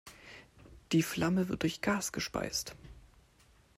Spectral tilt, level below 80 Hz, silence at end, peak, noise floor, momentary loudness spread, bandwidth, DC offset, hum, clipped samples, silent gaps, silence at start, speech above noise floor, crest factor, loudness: -4.5 dB/octave; -58 dBFS; 0.8 s; -18 dBFS; -64 dBFS; 21 LU; 16 kHz; under 0.1%; none; under 0.1%; none; 0.05 s; 32 dB; 18 dB; -33 LUFS